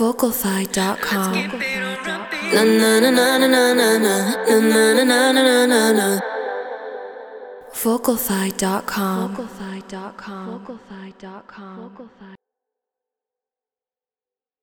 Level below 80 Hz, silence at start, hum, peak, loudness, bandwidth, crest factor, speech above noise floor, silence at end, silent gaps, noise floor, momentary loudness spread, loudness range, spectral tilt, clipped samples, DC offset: -58 dBFS; 0 s; none; -2 dBFS; -17 LUFS; over 20 kHz; 18 dB; over 72 dB; 2.3 s; none; under -90 dBFS; 22 LU; 20 LU; -3.5 dB/octave; under 0.1%; under 0.1%